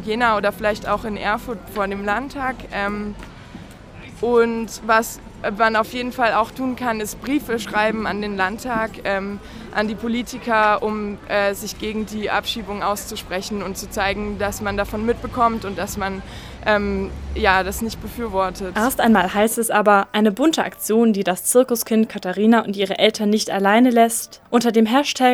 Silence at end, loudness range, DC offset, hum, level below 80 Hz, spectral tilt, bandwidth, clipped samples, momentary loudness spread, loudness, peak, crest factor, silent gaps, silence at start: 0 s; 6 LU; under 0.1%; none; -40 dBFS; -4 dB/octave; 18.5 kHz; under 0.1%; 11 LU; -20 LUFS; 0 dBFS; 20 dB; none; 0 s